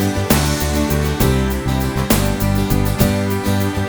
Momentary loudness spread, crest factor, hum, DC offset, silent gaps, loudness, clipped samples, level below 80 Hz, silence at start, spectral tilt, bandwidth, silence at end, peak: 3 LU; 16 dB; none; 0.6%; none; -17 LUFS; under 0.1%; -24 dBFS; 0 s; -5.5 dB/octave; over 20 kHz; 0 s; 0 dBFS